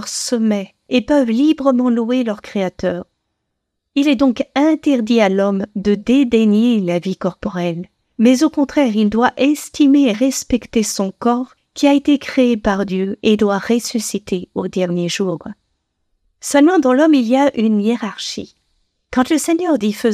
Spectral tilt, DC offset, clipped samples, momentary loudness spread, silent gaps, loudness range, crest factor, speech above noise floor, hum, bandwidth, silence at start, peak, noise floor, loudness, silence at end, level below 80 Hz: -5 dB/octave; under 0.1%; under 0.1%; 10 LU; none; 3 LU; 16 dB; 59 dB; none; 15 kHz; 0 s; 0 dBFS; -74 dBFS; -16 LUFS; 0 s; -48 dBFS